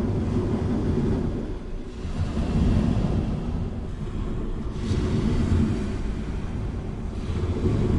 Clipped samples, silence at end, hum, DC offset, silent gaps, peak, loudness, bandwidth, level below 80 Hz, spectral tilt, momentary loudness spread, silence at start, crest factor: under 0.1%; 0 s; none; under 0.1%; none; -10 dBFS; -27 LUFS; 11 kHz; -30 dBFS; -8 dB/octave; 9 LU; 0 s; 14 dB